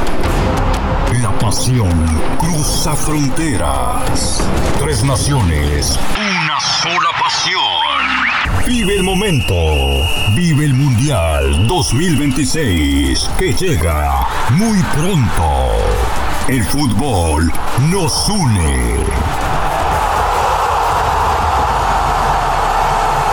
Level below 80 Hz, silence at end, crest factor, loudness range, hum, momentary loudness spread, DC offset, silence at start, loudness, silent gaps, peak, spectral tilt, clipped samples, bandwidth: -22 dBFS; 0 s; 8 dB; 2 LU; none; 4 LU; under 0.1%; 0 s; -14 LUFS; none; -4 dBFS; -4.5 dB/octave; under 0.1%; over 20 kHz